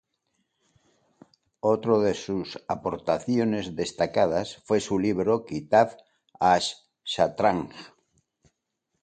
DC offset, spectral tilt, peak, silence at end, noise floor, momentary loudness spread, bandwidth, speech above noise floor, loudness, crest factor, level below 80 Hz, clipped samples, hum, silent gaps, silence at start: under 0.1%; -5.5 dB/octave; -6 dBFS; 1.15 s; -80 dBFS; 10 LU; 9.4 kHz; 55 dB; -26 LUFS; 20 dB; -58 dBFS; under 0.1%; none; none; 1.65 s